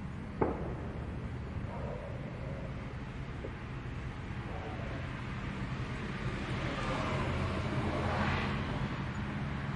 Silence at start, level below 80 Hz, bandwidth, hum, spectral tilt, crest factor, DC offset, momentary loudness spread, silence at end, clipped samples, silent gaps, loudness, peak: 0 s; -46 dBFS; 11 kHz; none; -7 dB/octave; 22 dB; under 0.1%; 8 LU; 0 s; under 0.1%; none; -38 LUFS; -14 dBFS